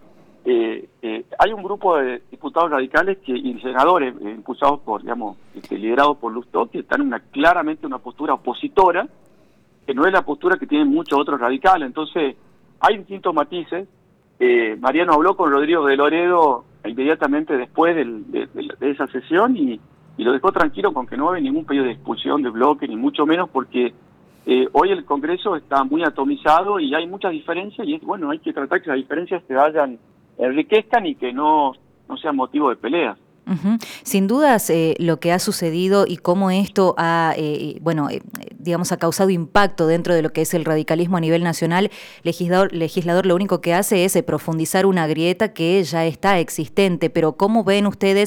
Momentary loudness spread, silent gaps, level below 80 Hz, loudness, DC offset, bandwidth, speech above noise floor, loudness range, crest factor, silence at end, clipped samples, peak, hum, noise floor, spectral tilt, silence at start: 9 LU; none; -52 dBFS; -19 LUFS; under 0.1%; 19 kHz; 36 dB; 3 LU; 16 dB; 0 s; under 0.1%; -4 dBFS; none; -55 dBFS; -5.5 dB/octave; 0.45 s